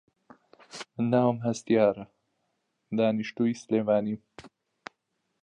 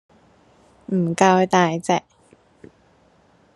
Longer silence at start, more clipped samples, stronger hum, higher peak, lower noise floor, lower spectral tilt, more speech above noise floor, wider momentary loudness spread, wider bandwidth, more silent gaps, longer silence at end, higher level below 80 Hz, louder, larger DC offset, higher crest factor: second, 0.75 s vs 0.9 s; neither; neither; second, -10 dBFS vs 0 dBFS; first, -79 dBFS vs -57 dBFS; about the same, -6.5 dB/octave vs -5.5 dB/octave; first, 53 dB vs 39 dB; first, 24 LU vs 8 LU; second, 10 kHz vs 11.5 kHz; neither; second, 0.95 s vs 1.55 s; second, -70 dBFS vs -64 dBFS; second, -27 LUFS vs -19 LUFS; neither; about the same, 20 dB vs 22 dB